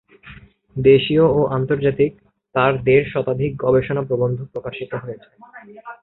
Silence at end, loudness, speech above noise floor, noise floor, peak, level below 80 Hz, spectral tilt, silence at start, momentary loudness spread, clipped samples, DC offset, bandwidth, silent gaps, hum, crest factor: 0.1 s; -18 LUFS; 25 dB; -43 dBFS; -2 dBFS; -48 dBFS; -11 dB/octave; 0.25 s; 16 LU; under 0.1%; under 0.1%; 4.1 kHz; none; none; 18 dB